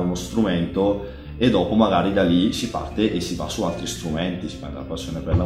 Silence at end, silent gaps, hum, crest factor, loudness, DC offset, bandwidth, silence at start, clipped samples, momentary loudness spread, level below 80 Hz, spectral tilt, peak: 0 s; none; none; 18 dB; -22 LUFS; under 0.1%; 15.5 kHz; 0 s; under 0.1%; 12 LU; -38 dBFS; -6 dB/octave; -4 dBFS